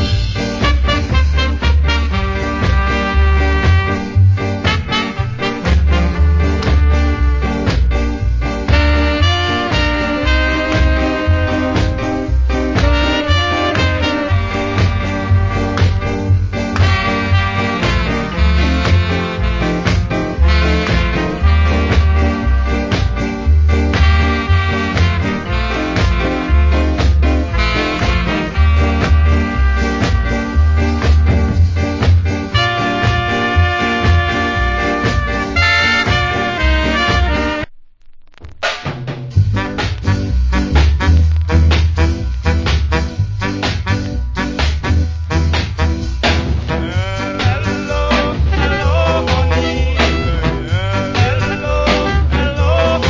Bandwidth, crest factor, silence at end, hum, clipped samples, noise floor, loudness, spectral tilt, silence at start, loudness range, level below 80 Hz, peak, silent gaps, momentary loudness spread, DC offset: 7.6 kHz; 14 dB; 0 s; none; under 0.1%; -36 dBFS; -15 LUFS; -6 dB/octave; 0 s; 3 LU; -16 dBFS; 0 dBFS; none; 5 LU; under 0.1%